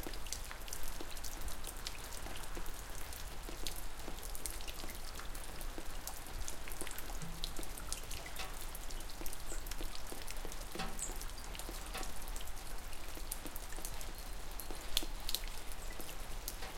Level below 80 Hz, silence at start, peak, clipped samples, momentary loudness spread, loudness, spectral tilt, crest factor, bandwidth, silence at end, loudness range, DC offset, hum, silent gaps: -46 dBFS; 0 s; -10 dBFS; under 0.1%; 6 LU; -45 LUFS; -2 dB/octave; 30 dB; 17 kHz; 0 s; 3 LU; under 0.1%; none; none